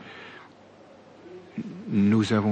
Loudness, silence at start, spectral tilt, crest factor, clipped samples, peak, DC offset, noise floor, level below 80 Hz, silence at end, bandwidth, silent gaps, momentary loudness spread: -25 LUFS; 0 s; -7 dB/octave; 16 dB; under 0.1%; -12 dBFS; under 0.1%; -51 dBFS; -70 dBFS; 0 s; 8.8 kHz; none; 25 LU